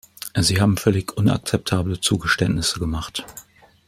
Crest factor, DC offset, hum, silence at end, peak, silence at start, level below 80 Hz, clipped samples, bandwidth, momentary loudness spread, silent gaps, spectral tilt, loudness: 20 dB; under 0.1%; none; 0.45 s; -2 dBFS; 0.25 s; -42 dBFS; under 0.1%; 16 kHz; 11 LU; none; -4.5 dB/octave; -21 LUFS